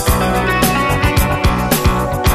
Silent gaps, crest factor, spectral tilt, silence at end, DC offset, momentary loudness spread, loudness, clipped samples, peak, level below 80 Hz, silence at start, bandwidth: none; 12 dB; -5 dB/octave; 0 s; under 0.1%; 2 LU; -14 LUFS; under 0.1%; -2 dBFS; -20 dBFS; 0 s; 15.5 kHz